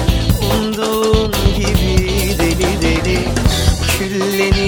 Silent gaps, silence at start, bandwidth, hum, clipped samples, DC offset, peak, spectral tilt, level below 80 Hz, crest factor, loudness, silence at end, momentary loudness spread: none; 0 s; over 20 kHz; none; under 0.1%; under 0.1%; 0 dBFS; -5 dB/octave; -20 dBFS; 14 dB; -15 LUFS; 0 s; 2 LU